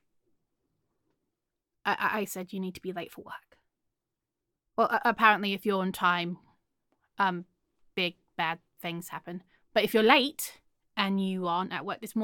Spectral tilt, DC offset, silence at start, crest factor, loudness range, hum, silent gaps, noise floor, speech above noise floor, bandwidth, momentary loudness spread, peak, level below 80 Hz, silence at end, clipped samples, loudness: -4.5 dB/octave; under 0.1%; 1.85 s; 26 dB; 8 LU; none; none; -87 dBFS; 58 dB; 17.5 kHz; 18 LU; -6 dBFS; -74 dBFS; 0 s; under 0.1%; -29 LUFS